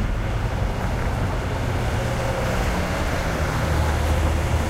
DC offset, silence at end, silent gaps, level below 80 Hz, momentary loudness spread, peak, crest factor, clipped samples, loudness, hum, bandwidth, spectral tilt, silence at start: under 0.1%; 0 s; none; -26 dBFS; 3 LU; -10 dBFS; 12 dB; under 0.1%; -24 LUFS; none; 16 kHz; -6 dB/octave; 0 s